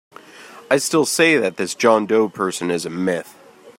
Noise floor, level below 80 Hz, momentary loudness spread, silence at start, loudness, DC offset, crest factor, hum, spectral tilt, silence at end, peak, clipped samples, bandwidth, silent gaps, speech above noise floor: -42 dBFS; -66 dBFS; 8 LU; 0.35 s; -18 LUFS; under 0.1%; 18 dB; none; -3.5 dB/octave; 0.1 s; -2 dBFS; under 0.1%; 16 kHz; none; 24 dB